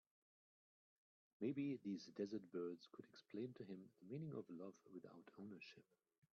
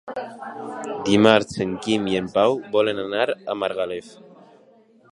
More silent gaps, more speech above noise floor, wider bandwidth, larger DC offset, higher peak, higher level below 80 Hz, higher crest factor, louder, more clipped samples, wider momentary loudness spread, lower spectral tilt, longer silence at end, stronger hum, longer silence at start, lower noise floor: neither; first, over 38 dB vs 32 dB; second, 7 kHz vs 11.5 kHz; neither; second, -34 dBFS vs 0 dBFS; second, under -90 dBFS vs -58 dBFS; about the same, 18 dB vs 22 dB; second, -52 LUFS vs -21 LUFS; neither; second, 14 LU vs 17 LU; first, -7 dB/octave vs -5 dB/octave; second, 0.5 s vs 1 s; neither; first, 1.4 s vs 0.05 s; first, under -90 dBFS vs -54 dBFS